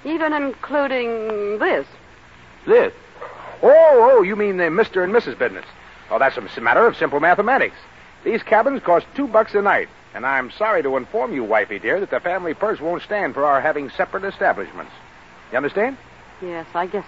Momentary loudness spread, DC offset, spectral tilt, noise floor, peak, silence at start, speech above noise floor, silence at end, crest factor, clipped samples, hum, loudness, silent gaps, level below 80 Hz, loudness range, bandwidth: 12 LU; 0.2%; -6.5 dB/octave; -45 dBFS; -2 dBFS; 0.05 s; 27 dB; 0 s; 16 dB; under 0.1%; none; -18 LUFS; none; -56 dBFS; 6 LU; 7.6 kHz